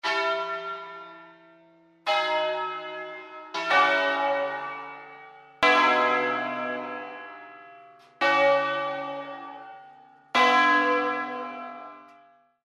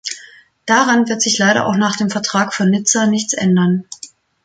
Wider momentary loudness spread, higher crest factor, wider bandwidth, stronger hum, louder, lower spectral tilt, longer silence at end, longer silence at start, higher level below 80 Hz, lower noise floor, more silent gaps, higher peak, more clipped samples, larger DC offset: first, 22 LU vs 15 LU; about the same, 18 dB vs 14 dB; first, 13 kHz vs 9.4 kHz; neither; second, -24 LUFS vs -15 LUFS; about the same, -2.5 dB/octave vs -3.5 dB/octave; first, 0.6 s vs 0.4 s; about the same, 0.05 s vs 0.05 s; second, -74 dBFS vs -58 dBFS; first, -58 dBFS vs -43 dBFS; neither; second, -8 dBFS vs -2 dBFS; neither; neither